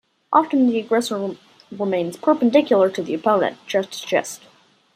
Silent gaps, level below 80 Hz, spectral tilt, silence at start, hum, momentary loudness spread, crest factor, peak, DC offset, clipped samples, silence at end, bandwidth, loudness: none; -72 dBFS; -5 dB/octave; 0.3 s; none; 13 LU; 18 dB; -2 dBFS; under 0.1%; under 0.1%; 0.6 s; 15 kHz; -20 LUFS